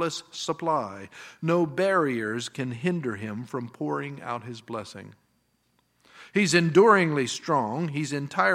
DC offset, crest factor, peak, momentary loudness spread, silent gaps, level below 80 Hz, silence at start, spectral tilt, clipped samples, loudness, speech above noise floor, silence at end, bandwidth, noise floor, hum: under 0.1%; 22 dB; -4 dBFS; 17 LU; none; -74 dBFS; 0 s; -5 dB/octave; under 0.1%; -26 LUFS; 44 dB; 0 s; 14 kHz; -70 dBFS; none